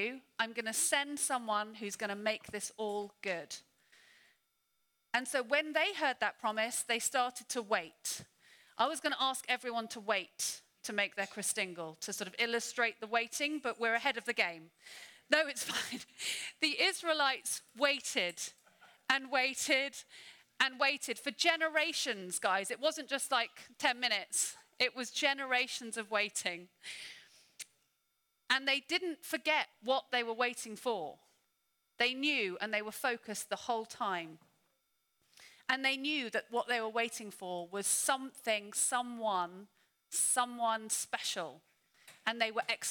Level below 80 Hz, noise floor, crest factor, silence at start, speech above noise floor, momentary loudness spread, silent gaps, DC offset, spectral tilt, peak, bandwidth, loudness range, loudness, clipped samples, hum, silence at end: -86 dBFS; -81 dBFS; 24 dB; 0 s; 45 dB; 10 LU; none; under 0.1%; -0.5 dB/octave; -12 dBFS; over 20 kHz; 4 LU; -34 LUFS; under 0.1%; none; 0 s